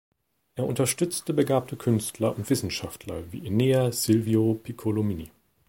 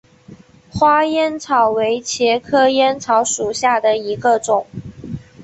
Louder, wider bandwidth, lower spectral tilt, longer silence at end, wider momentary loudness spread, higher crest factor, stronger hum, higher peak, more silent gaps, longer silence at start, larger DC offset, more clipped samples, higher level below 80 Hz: second, -26 LUFS vs -16 LUFS; first, 17 kHz vs 8.4 kHz; first, -5.5 dB/octave vs -3.5 dB/octave; first, 0.4 s vs 0 s; second, 13 LU vs 17 LU; about the same, 18 dB vs 14 dB; neither; second, -8 dBFS vs -2 dBFS; neither; first, 0.55 s vs 0.3 s; neither; neither; second, -56 dBFS vs -50 dBFS